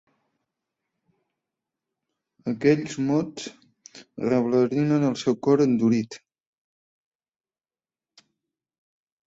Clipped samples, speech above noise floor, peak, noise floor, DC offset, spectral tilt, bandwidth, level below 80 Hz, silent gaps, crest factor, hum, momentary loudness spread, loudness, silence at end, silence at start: under 0.1%; over 67 dB; -6 dBFS; under -90 dBFS; under 0.1%; -7 dB/octave; 8 kHz; -66 dBFS; none; 20 dB; none; 17 LU; -23 LUFS; 3.1 s; 2.45 s